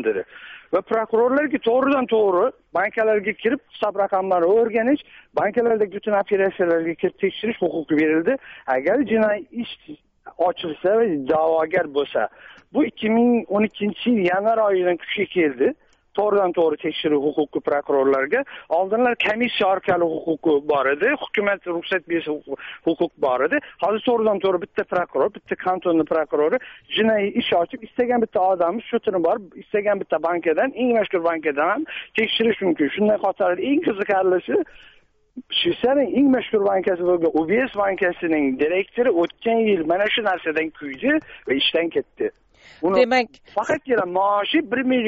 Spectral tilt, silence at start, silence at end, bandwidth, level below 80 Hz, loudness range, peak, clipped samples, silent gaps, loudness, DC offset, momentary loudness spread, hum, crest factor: -2.5 dB/octave; 0 s; 0 s; 7.6 kHz; -60 dBFS; 2 LU; -4 dBFS; under 0.1%; none; -21 LUFS; under 0.1%; 6 LU; none; 16 dB